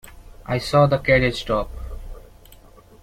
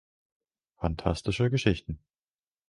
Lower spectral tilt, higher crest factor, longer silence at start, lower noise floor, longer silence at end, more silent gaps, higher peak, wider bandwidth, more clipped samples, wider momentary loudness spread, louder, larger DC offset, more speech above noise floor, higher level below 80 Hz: about the same, -6 dB/octave vs -6.5 dB/octave; about the same, 18 dB vs 22 dB; second, 0.05 s vs 0.8 s; second, -47 dBFS vs under -90 dBFS; second, 0.45 s vs 0.7 s; neither; first, -4 dBFS vs -10 dBFS; first, 15.5 kHz vs 11.5 kHz; neither; first, 21 LU vs 13 LU; first, -20 LUFS vs -29 LUFS; neither; second, 28 dB vs over 62 dB; first, -36 dBFS vs -44 dBFS